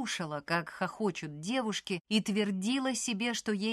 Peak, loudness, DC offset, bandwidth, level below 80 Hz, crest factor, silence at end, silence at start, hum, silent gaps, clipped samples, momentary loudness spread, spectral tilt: -16 dBFS; -33 LUFS; under 0.1%; 13 kHz; -72 dBFS; 16 dB; 0 s; 0 s; none; 2.01-2.05 s; under 0.1%; 5 LU; -4 dB/octave